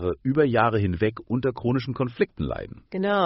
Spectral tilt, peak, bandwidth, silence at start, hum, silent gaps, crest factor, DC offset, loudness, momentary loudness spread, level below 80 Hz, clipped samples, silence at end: -6 dB/octave; -6 dBFS; 5.8 kHz; 0 s; none; none; 18 dB; under 0.1%; -25 LUFS; 10 LU; -46 dBFS; under 0.1%; 0 s